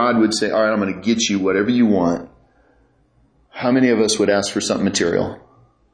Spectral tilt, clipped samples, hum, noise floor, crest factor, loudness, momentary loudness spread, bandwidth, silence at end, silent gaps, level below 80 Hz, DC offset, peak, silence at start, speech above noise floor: -4 dB/octave; under 0.1%; none; -58 dBFS; 14 dB; -18 LUFS; 7 LU; 10.5 kHz; 0.55 s; none; -54 dBFS; under 0.1%; -4 dBFS; 0 s; 41 dB